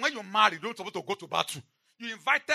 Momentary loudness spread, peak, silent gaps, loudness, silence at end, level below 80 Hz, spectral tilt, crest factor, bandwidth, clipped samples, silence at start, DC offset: 15 LU; -6 dBFS; none; -29 LUFS; 0 s; -84 dBFS; -2 dB/octave; 24 dB; 13.5 kHz; under 0.1%; 0 s; under 0.1%